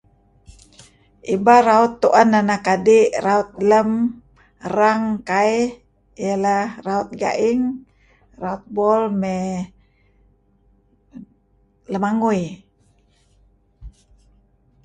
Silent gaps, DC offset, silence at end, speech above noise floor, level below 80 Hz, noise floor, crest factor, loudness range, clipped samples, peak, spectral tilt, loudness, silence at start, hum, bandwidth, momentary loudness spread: none; under 0.1%; 0.95 s; 42 dB; -54 dBFS; -60 dBFS; 20 dB; 11 LU; under 0.1%; 0 dBFS; -6 dB/octave; -18 LUFS; 0.5 s; none; 9.4 kHz; 15 LU